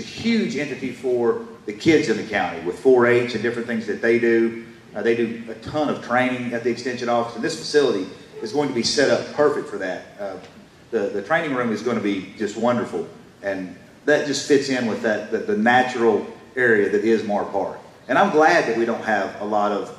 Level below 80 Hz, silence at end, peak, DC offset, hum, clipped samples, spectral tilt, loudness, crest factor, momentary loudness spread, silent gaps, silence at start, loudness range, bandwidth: -62 dBFS; 0 s; -6 dBFS; under 0.1%; none; under 0.1%; -4.5 dB/octave; -21 LUFS; 16 dB; 12 LU; none; 0 s; 5 LU; 12.5 kHz